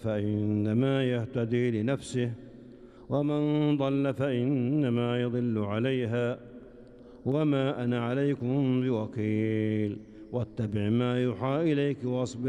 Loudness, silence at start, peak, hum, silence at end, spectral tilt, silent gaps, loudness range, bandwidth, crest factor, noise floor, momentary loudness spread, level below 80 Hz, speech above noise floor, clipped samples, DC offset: -29 LUFS; 0 s; -16 dBFS; none; 0 s; -8 dB/octave; none; 2 LU; 10.5 kHz; 14 dB; -50 dBFS; 7 LU; -62 dBFS; 22 dB; under 0.1%; under 0.1%